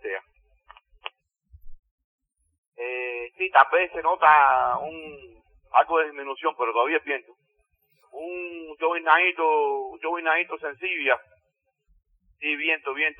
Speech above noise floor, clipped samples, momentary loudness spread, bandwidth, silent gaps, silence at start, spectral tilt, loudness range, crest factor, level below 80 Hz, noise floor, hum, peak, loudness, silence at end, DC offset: 52 dB; under 0.1%; 18 LU; 4.5 kHz; 1.79-1.83 s, 1.91-1.98 s, 2.04-2.19 s, 2.58-2.72 s; 0.05 s; -5.5 dB/octave; 6 LU; 24 dB; -60 dBFS; -75 dBFS; none; 0 dBFS; -23 LUFS; 0.05 s; under 0.1%